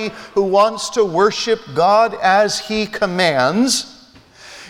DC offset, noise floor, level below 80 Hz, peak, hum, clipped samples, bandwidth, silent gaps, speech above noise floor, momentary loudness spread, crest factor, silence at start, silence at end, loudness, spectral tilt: under 0.1%; -45 dBFS; -52 dBFS; 0 dBFS; none; under 0.1%; 18 kHz; none; 29 dB; 6 LU; 16 dB; 0 s; 0 s; -16 LUFS; -3.5 dB/octave